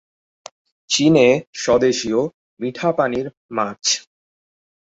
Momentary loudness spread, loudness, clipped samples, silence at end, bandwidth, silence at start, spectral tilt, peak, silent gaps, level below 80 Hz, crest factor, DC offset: 13 LU; -19 LUFS; under 0.1%; 0.95 s; 8 kHz; 0.9 s; -4 dB/octave; -2 dBFS; 1.47-1.53 s, 2.34-2.57 s, 3.37-3.49 s; -56 dBFS; 18 dB; under 0.1%